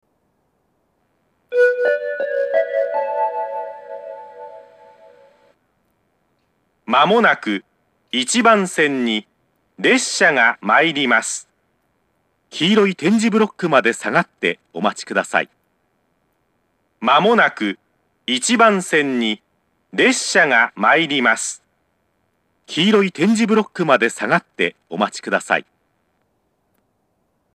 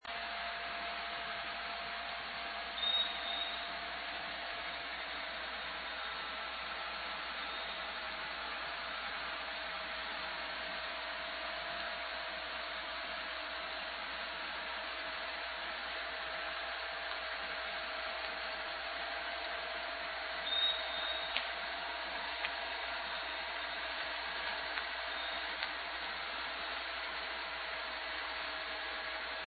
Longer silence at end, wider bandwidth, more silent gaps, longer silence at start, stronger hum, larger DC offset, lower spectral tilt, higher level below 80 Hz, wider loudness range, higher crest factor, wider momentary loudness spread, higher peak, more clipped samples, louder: first, 1.95 s vs 0 s; first, 13 kHz vs 4.9 kHz; neither; first, 1.5 s vs 0 s; neither; neither; first, -3.5 dB/octave vs 2 dB/octave; second, -78 dBFS vs -64 dBFS; first, 7 LU vs 3 LU; second, 20 dB vs 26 dB; first, 13 LU vs 4 LU; first, 0 dBFS vs -14 dBFS; neither; first, -17 LUFS vs -39 LUFS